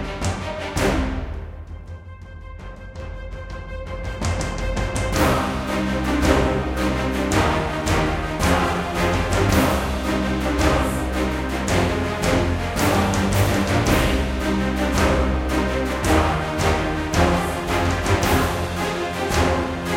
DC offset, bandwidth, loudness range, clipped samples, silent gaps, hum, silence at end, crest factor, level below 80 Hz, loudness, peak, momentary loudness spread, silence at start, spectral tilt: under 0.1%; 17 kHz; 8 LU; under 0.1%; none; none; 0 s; 20 dB; -28 dBFS; -21 LUFS; -2 dBFS; 15 LU; 0 s; -5 dB/octave